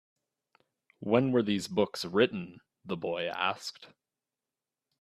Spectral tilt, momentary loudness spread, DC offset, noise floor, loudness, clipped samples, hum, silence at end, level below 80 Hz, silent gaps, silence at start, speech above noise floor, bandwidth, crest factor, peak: -5.5 dB/octave; 14 LU; under 0.1%; under -90 dBFS; -30 LUFS; under 0.1%; none; 1.15 s; -72 dBFS; none; 1 s; over 60 dB; 14.5 kHz; 22 dB; -10 dBFS